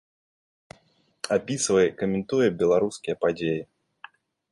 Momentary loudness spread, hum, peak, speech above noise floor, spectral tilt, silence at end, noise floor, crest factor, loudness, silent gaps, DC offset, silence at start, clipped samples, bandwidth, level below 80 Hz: 7 LU; none; -8 dBFS; 40 dB; -4.5 dB/octave; 0.9 s; -64 dBFS; 18 dB; -25 LUFS; none; under 0.1%; 1.25 s; under 0.1%; 11.5 kHz; -60 dBFS